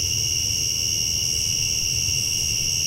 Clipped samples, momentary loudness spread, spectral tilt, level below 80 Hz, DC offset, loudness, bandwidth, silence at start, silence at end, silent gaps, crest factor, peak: under 0.1%; 0 LU; 0 dB/octave; -40 dBFS; under 0.1%; -20 LUFS; 16 kHz; 0 s; 0 s; none; 12 dB; -12 dBFS